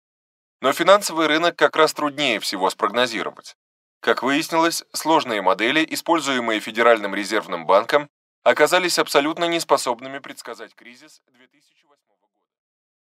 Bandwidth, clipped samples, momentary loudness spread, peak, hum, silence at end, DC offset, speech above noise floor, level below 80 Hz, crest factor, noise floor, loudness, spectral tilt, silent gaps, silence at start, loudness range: 16 kHz; under 0.1%; 10 LU; 0 dBFS; none; 2.15 s; under 0.1%; 52 dB; -78 dBFS; 20 dB; -72 dBFS; -19 LUFS; -2.5 dB/octave; 3.55-4.01 s, 8.10-8.42 s; 0.6 s; 6 LU